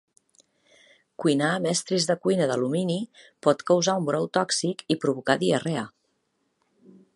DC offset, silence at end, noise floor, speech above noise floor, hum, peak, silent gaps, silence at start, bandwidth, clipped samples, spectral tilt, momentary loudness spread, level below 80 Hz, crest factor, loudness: under 0.1%; 1.25 s; -73 dBFS; 49 dB; none; -4 dBFS; none; 1.2 s; 11.5 kHz; under 0.1%; -4.5 dB/octave; 7 LU; -72 dBFS; 22 dB; -25 LUFS